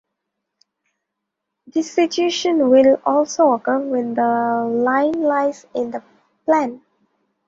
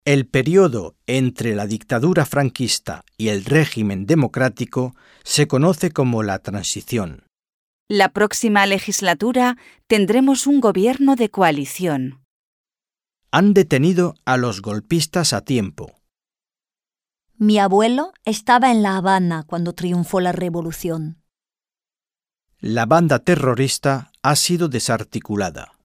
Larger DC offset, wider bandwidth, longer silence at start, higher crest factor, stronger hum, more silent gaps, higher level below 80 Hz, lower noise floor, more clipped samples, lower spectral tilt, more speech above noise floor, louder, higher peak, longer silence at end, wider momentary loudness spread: neither; second, 7.8 kHz vs 16.5 kHz; first, 1.75 s vs 0.05 s; about the same, 16 dB vs 18 dB; neither; second, none vs 7.54-7.87 s, 12.25-12.64 s; second, -64 dBFS vs -52 dBFS; second, -79 dBFS vs under -90 dBFS; neither; about the same, -4 dB/octave vs -5 dB/octave; second, 62 dB vs over 72 dB; about the same, -18 LUFS vs -18 LUFS; about the same, -2 dBFS vs -2 dBFS; first, 0.7 s vs 0.25 s; about the same, 12 LU vs 10 LU